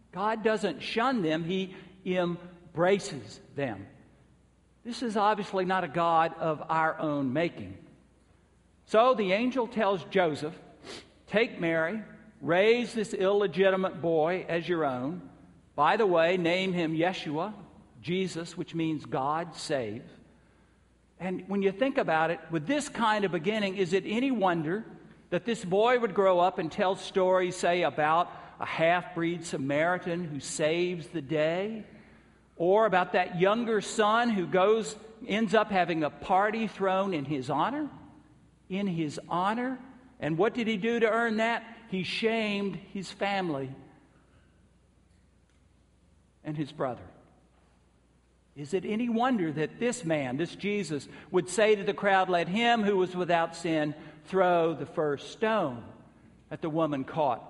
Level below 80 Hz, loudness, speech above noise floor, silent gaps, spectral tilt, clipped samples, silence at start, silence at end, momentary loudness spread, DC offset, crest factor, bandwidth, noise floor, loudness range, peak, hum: -66 dBFS; -29 LUFS; 36 dB; none; -5.5 dB/octave; under 0.1%; 0.15 s; 0 s; 12 LU; under 0.1%; 20 dB; 11.5 kHz; -64 dBFS; 7 LU; -10 dBFS; none